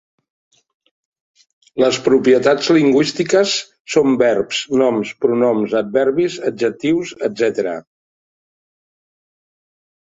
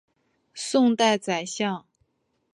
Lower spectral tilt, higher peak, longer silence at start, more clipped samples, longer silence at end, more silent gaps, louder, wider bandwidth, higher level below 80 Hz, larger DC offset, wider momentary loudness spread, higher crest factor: about the same, -4.5 dB/octave vs -3.5 dB/octave; first, -2 dBFS vs -6 dBFS; first, 1.75 s vs 0.55 s; neither; first, 2.3 s vs 0.75 s; first, 3.80-3.85 s vs none; first, -16 LUFS vs -23 LUFS; second, 8 kHz vs 11.5 kHz; first, -60 dBFS vs -74 dBFS; neither; second, 7 LU vs 16 LU; about the same, 16 dB vs 20 dB